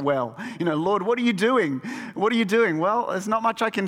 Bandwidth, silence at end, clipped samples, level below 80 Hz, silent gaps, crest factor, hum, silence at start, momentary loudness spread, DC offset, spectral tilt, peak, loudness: 15.5 kHz; 0 s; under 0.1%; -68 dBFS; none; 14 dB; none; 0 s; 7 LU; under 0.1%; -5.5 dB/octave; -8 dBFS; -23 LUFS